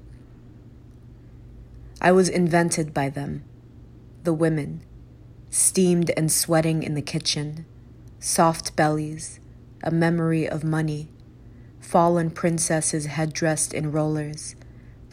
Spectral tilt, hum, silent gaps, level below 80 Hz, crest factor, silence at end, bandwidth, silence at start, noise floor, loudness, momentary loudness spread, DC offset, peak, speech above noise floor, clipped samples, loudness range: -4.5 dB/octave; none; none; -50 dBFS; 20 dB; 0.05 s; 16 kHz; 0 s; -46 dBFS; -23 LUFS; 15 LU; under 0.1%; -6 dBFS; 23 dB; under 0.1%; 3 LU